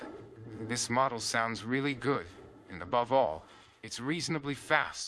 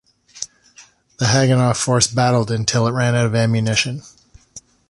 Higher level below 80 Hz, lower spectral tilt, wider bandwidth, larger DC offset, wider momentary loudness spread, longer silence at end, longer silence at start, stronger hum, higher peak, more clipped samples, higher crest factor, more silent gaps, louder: second, -66 dBFS vs -48 dBFS; about the same, -4 dB/octave vs -4.5 dB/octave; about the same, 12 kHz vs 11.5 kHz; neither; about the same, 18 LU vs 16 LU; second, 0 s vs 0.3 s; second, 0 s vs 0.35 s; neither; second, -10 dBFS vs -2 dBFS; neither; first, 24 dB vs 16 dB; neither; second, -32 LUFS vs -17 LUFS